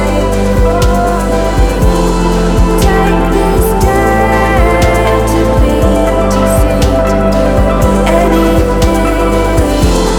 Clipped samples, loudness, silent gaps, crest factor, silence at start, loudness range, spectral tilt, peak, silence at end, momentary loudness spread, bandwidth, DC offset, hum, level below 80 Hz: under 0.1%; -10 LUFS; none; 8 dB; 0 s; 1 LU; -6 dB/octave; 0 dBFS; 0 s; 2 LU; 18 kHz; under 0.1%; none; -14 dBFS